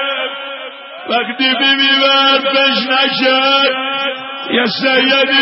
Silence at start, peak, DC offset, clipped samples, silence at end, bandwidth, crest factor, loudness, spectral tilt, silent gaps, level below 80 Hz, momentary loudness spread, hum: 0 s; 0 dBFS; under 0.1%; under 0.1%; 0 s; 6 kHz; 14 dB; -12 LUFS; -6 dB/octave; none; -76 dBFS; 14 LU; none